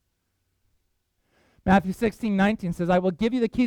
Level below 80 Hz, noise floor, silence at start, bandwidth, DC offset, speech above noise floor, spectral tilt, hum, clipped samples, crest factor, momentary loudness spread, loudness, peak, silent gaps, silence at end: -48 dBFS; -75 dBFS; 1.65 s; 13.5 kHz; under 0.1%; 52 dB; -7.5 dB/octave; none; under 0.1%; 18 dB; 6 LU; -24 LUFS; -6 dBFS; none; 0 s